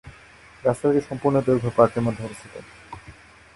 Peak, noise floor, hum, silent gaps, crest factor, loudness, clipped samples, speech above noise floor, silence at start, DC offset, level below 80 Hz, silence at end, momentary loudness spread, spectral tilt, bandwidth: -2 dBFS; -49 dBFS; none; none; 22 dB; -22 LUFS; under 0.1%; 27 dB; 0.05 s; under 0.1%; -52 dBFS; 0.45 s; 22 LU; -8 dB/octave; 11.5 kHz